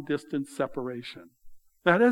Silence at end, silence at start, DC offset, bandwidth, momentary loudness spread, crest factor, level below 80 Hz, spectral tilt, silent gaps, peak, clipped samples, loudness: 0 s; 0 s; under 0.1%; 12.5 kHz; 17 LU; 22 dB; -62 dBFS; -6.5 dB/octave; none; -6 dBFS; under 0.1%; -29 LUFS